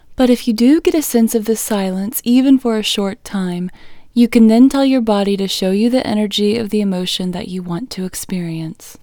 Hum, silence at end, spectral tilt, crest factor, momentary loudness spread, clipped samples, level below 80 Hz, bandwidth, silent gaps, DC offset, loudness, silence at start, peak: none; 0.1 s; -5 dB/octave; 14 dB; 13 LU; under 0.1%; -44 dBFS; over 20 kHz; none; under 0.1%; -15 LUFS; 0.1 s; 0 dBFS